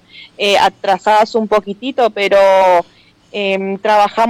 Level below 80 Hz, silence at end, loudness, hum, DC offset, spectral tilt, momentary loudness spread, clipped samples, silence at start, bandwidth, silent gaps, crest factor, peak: -52 dBFS; 0 s; -13 LUFS; none; under 0.1%; -4 dB/octave; 9 LU; under 0.1%; 0.15 s; 15.5 kHz; none; 10 dB; -4 dBFS